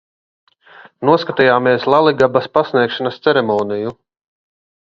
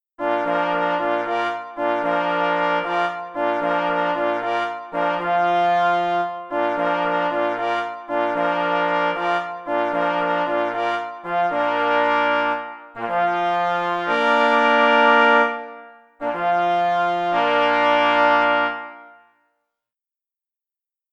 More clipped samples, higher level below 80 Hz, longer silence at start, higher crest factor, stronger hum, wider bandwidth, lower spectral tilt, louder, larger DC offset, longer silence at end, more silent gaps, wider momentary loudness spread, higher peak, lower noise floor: neither; first, -56 dBFS vs -66 dBFS; first, 1 s vs 0.2 s; about the same, 16 dB vs 18 dB; neither; second, 7.4 kHz vs 8.8 kHz; first, -7 dB/octave vs -5 dB/octave; first, -15 LUFS vs -20 LUFS; neither; second, 0.95 s vs 2.05 s; neither; about the same, 8 LU vs 9 LU; about the same, 0 dBFS vs -2 dBFS; second, -44 dBFS vs -90 dBFS